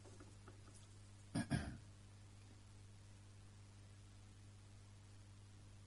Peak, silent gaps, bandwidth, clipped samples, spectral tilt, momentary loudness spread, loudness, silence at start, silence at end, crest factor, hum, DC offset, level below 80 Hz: -28 dBFS; none; 11.5 kHz; under 0.1%; -5.5 dB/octave; 17 LU; -54 LUFS; 0 s; 0 s; 24 dB; 50 Hz at -60 dBFS; under 0.1%; -66 dBFS